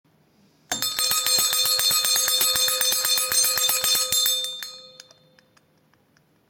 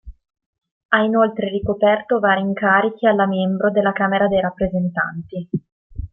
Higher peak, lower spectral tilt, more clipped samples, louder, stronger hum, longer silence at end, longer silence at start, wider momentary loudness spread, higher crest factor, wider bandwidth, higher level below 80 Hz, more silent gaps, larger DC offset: about the same, -4 dBFS vs -2 dBFS; second, 2 dB/octave vs -10.5 dB/octave; neither; about the same, -19 LUFS vs -18 LUFS; neither; first, 1.6 s vs 0.05 s; first, 0.7 s vs 0.05 s; second, 8 LU vs 11 LU; about the same, 20 dB vs 18 dB; first, 17 kHz vs 3.8 kHz; second, -64 dBFS vs -44 dBFS; second, none vs 0.46-0.53 s, 0.71-0.89 s, 5.72-5.90 s; neither